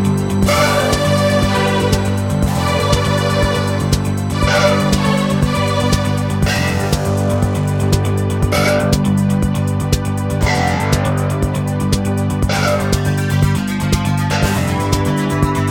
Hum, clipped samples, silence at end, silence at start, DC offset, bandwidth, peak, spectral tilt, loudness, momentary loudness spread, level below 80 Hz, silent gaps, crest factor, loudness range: none; under 0.1%; 0 s; 0 s; under 0.1%; 17 kHz; 0 dBFS; -5.5 dB/octave; -16 LUFS; 4 LU; -26 dBFS; none; 14 dB; 2 LU